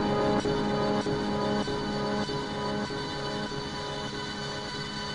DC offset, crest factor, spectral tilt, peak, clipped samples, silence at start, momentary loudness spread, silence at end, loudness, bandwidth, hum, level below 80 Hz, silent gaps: 0.2%; 16 dB; -5 dB/octave; -14 dBFS; under 0.1%; 0 s; 7 LU; 0 s; -30 LUFS; 11 kHz; none; -50 dBFS; none